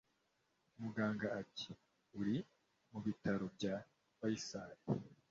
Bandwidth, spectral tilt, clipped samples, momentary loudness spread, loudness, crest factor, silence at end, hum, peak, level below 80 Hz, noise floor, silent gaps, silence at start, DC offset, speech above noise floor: 7.6 kHz; -5.5 dB/octave; under 0.1%; 10 LU; -44 LUFS; 20 dB; 0.15 s; none; -24 dBFS; -74 dBFS; -82 dBFS; none; 0.8 s; under 0.1%; 40 dB